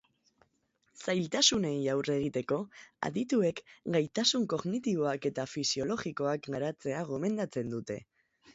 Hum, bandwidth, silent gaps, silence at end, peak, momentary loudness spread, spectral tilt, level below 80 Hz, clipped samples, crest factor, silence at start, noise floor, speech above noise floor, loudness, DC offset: none; 8.2 kHz; none; 0.05 s; -12 dBFS; 10 LU; -4 dB/octave; -68 dBFS; under 0.1%; 22 dB; 0.95 s; -75 dBFS; 43 dB; -32 LUFS; under 0.1%